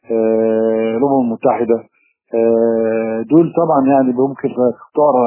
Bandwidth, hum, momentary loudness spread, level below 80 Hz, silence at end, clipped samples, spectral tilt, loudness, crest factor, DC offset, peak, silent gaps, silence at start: 3.1 kHz; none; 5 LU; -60 dBFS; 0 s; under 0.1%; -12 dB/octave; -15 LUFS; 14 dB; under 0.1%; 0 dBFS; none; 0.1 s